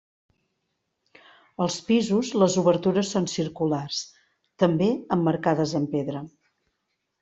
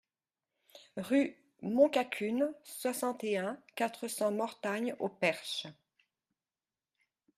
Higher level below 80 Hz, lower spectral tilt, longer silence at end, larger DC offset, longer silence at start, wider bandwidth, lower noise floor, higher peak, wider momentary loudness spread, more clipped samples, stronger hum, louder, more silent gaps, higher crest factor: first, -64 dBFS vs -82 dBFS; first, -5.5 dB/octave vs -4 dB/octave; second, 0.95 s vs 1.65 s; neither; first, 1.6 s vs 0.75 s; second, 8 kHz vs 15.5 kHz; second, -78 dBFS vs under -90 dBFS; first, -6 dBFS vs -14 dBFS; about the same, 11 LU vs 11 LU; neither; neither; first, -24 LUFS vs -34 LUFS; neither; about the same, 20 dB vs 22 dB